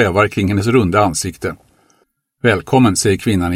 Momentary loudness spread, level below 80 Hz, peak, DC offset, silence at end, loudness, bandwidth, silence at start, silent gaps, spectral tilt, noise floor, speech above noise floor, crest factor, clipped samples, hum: 9 LU; -40 dBFS; 0 dBFS; under 0.1%; 0 s; -15 LUFS; 16.5 kHz; 0 s; none; -5 dB/octave; -61 dBFS; 47 dB; 16 dB; under 0.1%; none